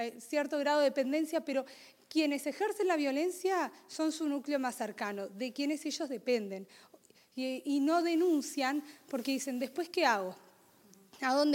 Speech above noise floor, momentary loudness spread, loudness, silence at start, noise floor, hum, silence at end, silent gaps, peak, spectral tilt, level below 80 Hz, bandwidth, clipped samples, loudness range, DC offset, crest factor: 29 dB; 10 LU; -33 LUFS; 0 s; -62 dBFS; none; 0 s; none; -14 dBFS; -3 dB/octave; -90 dBFS; 17 kHz; under 0.1%; 4 LU; under 0.1%; 20 dB